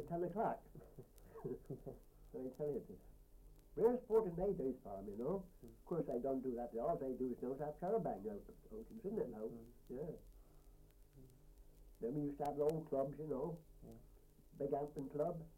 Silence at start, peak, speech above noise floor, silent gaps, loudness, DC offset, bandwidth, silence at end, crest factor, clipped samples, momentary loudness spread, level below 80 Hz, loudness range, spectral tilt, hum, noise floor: 0 s; -24 dBFS; 22 dB; none; -43 LUFS; under 0.1%; 16.5 kHz; 0 s; 20 dB; under 0.1%; 20 LU; -64 dBFS; 9 LU; -9 dB/octave; none; -65 dBFS